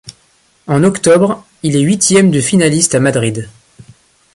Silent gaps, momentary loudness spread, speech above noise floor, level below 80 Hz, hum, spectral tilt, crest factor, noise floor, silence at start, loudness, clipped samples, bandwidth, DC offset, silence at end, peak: none; 10 LU; 42 dB; -48 dBFS; none; -4.5 dB/octave; 12 dB; -53 dBFS; 0.05 s; -11 LUFS; under 0.1%; 11.5 kHz; under 0.1%; 0.85 s; 0 dBFS